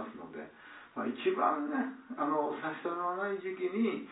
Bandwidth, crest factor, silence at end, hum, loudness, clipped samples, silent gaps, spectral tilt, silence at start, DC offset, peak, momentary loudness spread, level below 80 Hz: 4 kHz; 20 dB; 0 s; none; -34 LUFS; under 0.1%; none; -9 dB/octave; 0 s; under 0.1%; -16 dBFS; 15 LU; -84 dBFS